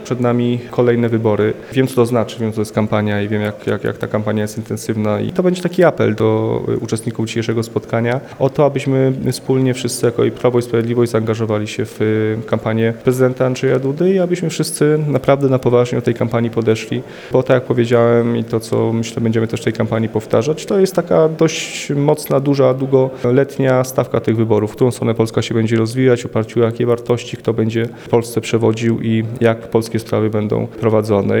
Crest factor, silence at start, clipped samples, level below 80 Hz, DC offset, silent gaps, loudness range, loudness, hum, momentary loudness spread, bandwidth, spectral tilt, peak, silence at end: 16 dB; 0 s; under 0.1%; -52 dBFS; under 0.1%; none; 2 LU; -16 LUFS; none; 6 LU; 18 kHz; -6.5 dB/octave; 0 dBFS; 0 s